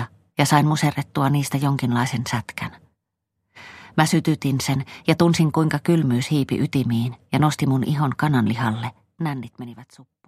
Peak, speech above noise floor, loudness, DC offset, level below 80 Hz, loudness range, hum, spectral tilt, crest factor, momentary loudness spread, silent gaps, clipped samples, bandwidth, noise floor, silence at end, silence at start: -2 dBFS; 58 dB; -21 LUFS; under 0.1%; -56 dBFS; 4 LU; none; -6 dB/octave; 18 dB; 12 LU; none; under 0.1%; 15 kHz; -78 dBFS; 0.45 s; 0 s